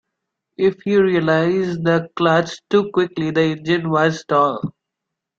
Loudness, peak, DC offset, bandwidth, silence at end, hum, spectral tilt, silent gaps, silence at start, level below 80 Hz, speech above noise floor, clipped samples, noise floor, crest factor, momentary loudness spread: -18 LUFS; -2 dBFS; under 0.1%; 7.6 kHz; 0.7 s; none; -6.5 dB/octave; none; 0.6 s; -58 dBFS; 64 dB; under 0.1%; -82 dBFS; 16 dB; 4 LU